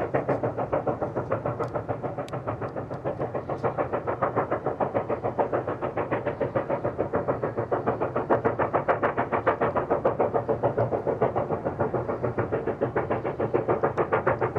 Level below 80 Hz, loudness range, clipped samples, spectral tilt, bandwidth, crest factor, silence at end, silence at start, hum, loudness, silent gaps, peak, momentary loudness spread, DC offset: -54 dBFS; 4 LU; under 0.1%; -9.5 dB/octave; 8.2 kHz; 18 dB; 0 s; 0 s; none; -27 LUFS; none; -8 dBFS; 6 LU; under 0.1%